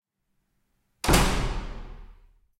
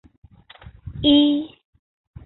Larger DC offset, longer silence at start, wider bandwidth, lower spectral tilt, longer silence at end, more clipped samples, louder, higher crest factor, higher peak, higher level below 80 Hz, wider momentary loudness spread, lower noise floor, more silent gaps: neither; first, 1.05 s vs 0.85 s; first, 16.5 kHz vs 4.2 kHz; second, -4 dB/octave vs -10 dB/octave; second, 0.5 s vs 0.8 s; neither; second, -25 LUFS vs -18 LUFS; first, 26 dB vs 18 dB; about the same, -4 dBFS vs -6 dBFS; first, -34 dBFS vs -46 dBFS; second, 20 LU vs 23 LU; first, -75 dBFS vs -46 dBFS; neither